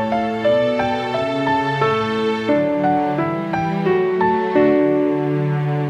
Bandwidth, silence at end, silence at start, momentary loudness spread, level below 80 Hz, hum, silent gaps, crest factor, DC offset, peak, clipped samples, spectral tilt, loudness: 9.4 kHz; 0 s; 0 s; 5 LU; -52 dBFS; none; none; 14 dB; under 0.1%; -4 dBFS; under 0.1%; -7.5 dB/octave; -18 LUFS